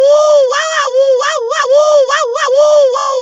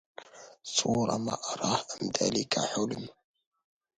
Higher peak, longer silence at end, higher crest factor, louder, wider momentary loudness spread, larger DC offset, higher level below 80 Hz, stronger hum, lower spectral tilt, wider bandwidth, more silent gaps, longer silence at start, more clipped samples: first, 0 dBFS vs -8 dBFS; second, 0 s vs 0.85 s; second, 10 dB vs 24 dB; first, -10 LUFS vs -30 LUFS; second, 5 LU vs 19 LU; neither; about the same, -66 dBFS vs -66 dBFS; neither; second, 2 dB/octave vs -3.5 dB/octave; second, 8.2 kHz vs 10.5 kHz; neither; second, 0 s vs 0.2 s; neither